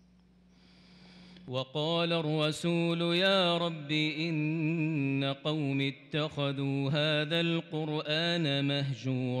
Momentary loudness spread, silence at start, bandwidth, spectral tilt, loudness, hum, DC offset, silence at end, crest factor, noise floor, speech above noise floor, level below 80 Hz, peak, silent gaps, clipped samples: 6 LU; 1.05 s; 12 kHz; -6 dB/octave; -30 LUFS; none; under 0.1%; 0 s; 14 dB; -62 dBFS; 31 dB; -74 dBFS; -18 dBFS; none; under 0.1%